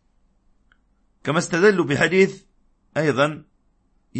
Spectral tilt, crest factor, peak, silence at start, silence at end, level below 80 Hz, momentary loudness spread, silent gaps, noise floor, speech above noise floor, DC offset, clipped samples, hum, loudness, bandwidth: -5.5 dB/octave; 20 dB; -2 dBFS; 1.25 s; 0 s; -60 dBFS; 12 LU; none; -63 dBFS; 44 dB; under 0.1%; under 0.1%; none; -20 LUFS; 8.8 kHz